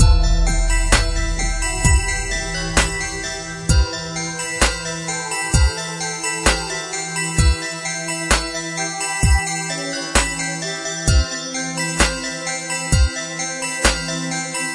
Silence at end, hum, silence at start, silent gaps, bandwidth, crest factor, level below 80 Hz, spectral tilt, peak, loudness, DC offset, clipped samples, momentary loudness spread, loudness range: 0 s; none; 0 s; none; 11.5 kHz; 18 dB; -22 dBFS; -3 dB/octave; 0 dBFS; -20 LUFS; under 0.1%; under 0.1%; 6 LU; 1 LU